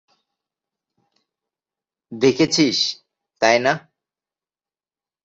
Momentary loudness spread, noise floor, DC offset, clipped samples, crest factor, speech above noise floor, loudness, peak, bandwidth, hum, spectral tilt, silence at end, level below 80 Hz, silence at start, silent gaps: 13 LU; under -90 dBFS; under 0.1%; under 0.1%; 22 dB; over 72 dB; -18 LUFS; -2 dBFS; 8 kHz; none; -3.5 dB/octave; 1.45 s; -62 dBFS; 2.1 s; none